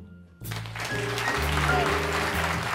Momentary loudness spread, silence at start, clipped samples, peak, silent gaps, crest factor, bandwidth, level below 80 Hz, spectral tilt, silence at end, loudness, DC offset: 12 LU; 0 s; under 0.1%; -8 dBFS; none; 18 dB; 16 kHz; -38 dBFS; -4 dB/octave; 0 s; -26 LUFS; under 0.1%